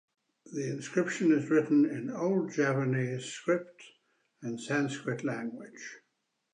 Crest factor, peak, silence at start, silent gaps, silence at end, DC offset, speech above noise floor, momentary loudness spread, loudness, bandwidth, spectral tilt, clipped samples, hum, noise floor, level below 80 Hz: 16 dB; -14 dBFS; 0.45 s; none; 0.55 s; under 0.1%; 50 dB; 17 LU; -31 LUFS; 10 kHz; -6 dB/octave; under 0.1%; none; -80 dBFS; -82 dBFS